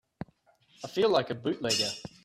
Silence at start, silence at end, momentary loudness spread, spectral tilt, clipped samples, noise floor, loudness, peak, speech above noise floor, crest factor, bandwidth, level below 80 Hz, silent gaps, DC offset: 0.2 s; 0.15 s; 20 LU; -3.5 dB/octave; under 0.1%; -65 dBFS; -29 LUFS; -12 dBFS; 36 dB; 20 dB; 15 kHz; -66 dBFS; none; under 0.1%